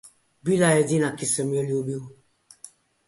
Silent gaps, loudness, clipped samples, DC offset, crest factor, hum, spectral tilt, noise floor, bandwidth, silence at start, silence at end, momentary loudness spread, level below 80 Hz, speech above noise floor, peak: none; -23 LUFS; under 0.1%; under 0.1%; 18 dB; none; -5 dB/octave; -50 dBFS; 12 kHz; 0.05 s; 0.4 s; 13 LU; -64 dBFS; 27 dB; -8 dBFS